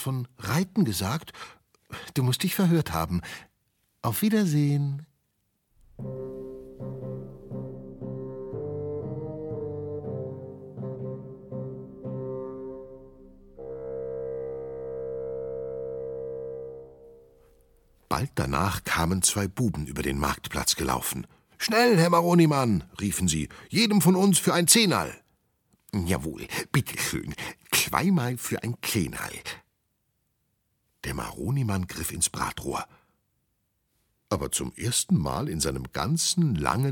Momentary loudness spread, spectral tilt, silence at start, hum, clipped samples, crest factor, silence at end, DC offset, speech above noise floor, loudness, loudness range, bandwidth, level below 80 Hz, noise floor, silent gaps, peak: 19 LU; -4.5 dB/octave; 0 s; none; under 0.1%; 26 dB; 0 s; under 0.1%; 49 dB; -27 LUFS; 14 LU; 19 kHz; -48 dBFS; -75 dBFS; none; -2 dBFS